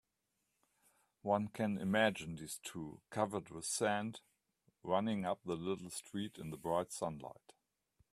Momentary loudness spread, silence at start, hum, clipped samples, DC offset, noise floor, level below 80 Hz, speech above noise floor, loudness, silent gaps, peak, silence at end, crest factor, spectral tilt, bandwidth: 12 LU; 1.25 s; none; under 0.1%; under 0.1%; -85 dBFS; -74 dBFS; 46 dB; -39 LUFS; none; -18 dBFS; 0.8 s; 22 dB; -4.5 dB/octave; 14.5 kHz